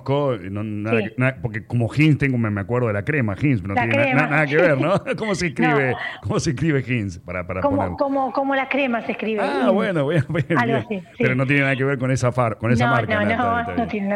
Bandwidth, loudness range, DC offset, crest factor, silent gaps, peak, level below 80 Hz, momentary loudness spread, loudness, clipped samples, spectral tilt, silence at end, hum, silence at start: 11 kHz; 3 LU; under 0.1%; 14 dB; none; -6 dBFS; -50 dBFS; 7 LU; -20 LUFS; under 0.1%; -7 dB/octave; 0 s; none; 0 s